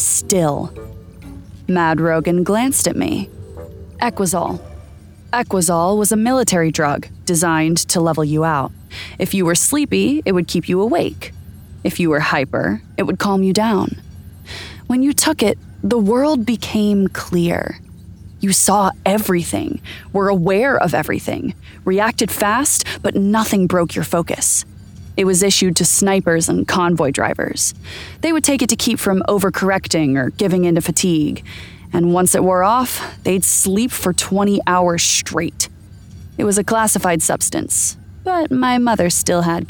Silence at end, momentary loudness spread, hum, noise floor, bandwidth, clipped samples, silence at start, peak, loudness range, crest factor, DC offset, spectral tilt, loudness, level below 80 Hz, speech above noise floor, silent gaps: 0 s; 12 LU; none; -39 dBFS; over 20 kHz; under 0.1%; 0 s; 0 dBFS; 3 LU; 16 dB; under 0.1%; -4 dB/octave; -16 LUFS; -44 dBFS; 23 dB; none